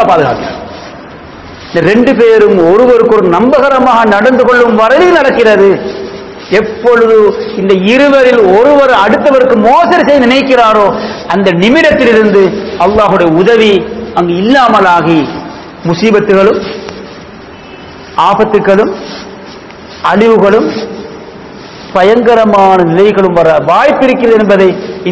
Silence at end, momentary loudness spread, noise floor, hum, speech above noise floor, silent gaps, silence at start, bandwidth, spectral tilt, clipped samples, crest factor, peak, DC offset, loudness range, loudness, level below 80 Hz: 0 s; 17 LU; -28 dBFS; none; 23 dB; none; 0 s; 8 kHz; -6.5 dB/octave; 8%; 6 dB; 0 dBFS; under 0.1%; 6 LU; -6 LUFS; -38 dBFS